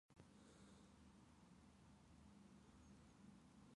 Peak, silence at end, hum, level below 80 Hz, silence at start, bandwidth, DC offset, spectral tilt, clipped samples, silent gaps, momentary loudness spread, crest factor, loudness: -48 dBFS; 0 s; none; -78 dBFS; 0.1 s; 11 kHz; under 0.1%; -5.5 dB/octave; under 0.1%; none; 2 LU; 20 dB; -68 LUFS